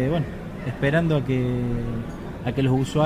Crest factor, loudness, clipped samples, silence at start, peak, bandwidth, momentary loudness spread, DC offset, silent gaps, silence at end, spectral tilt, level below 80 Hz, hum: 16 dB; -25 LUFS; under 0.1%; 0 s; -6 dBFS; 12 kHz; 10 LU; under 0.1%; none; 0 s; -7.5 dB/octave; -38 dBFS; none